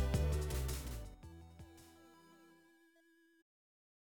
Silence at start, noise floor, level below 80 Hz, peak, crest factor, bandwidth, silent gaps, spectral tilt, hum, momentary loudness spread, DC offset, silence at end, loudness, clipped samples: 0 s; -71 dBFS; -46 dBFS; -24 dBFS; 18 dB; over 20 kHz; none; -5.5 dB/octave; none; 26 LU; under 0.1%; 1.75 s; -41 LUFS; under 0.1%